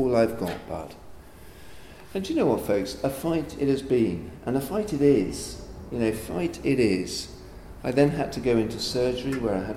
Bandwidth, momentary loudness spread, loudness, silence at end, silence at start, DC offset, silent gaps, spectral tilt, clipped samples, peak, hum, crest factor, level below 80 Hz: 16.5 kHz; 13 LU; -26 LUFS; 0 s; 0 s; under 0.1%; none; -6 dB/octave; under 0.1%; -6 dBFS; none; 20 dB; -46 dBFS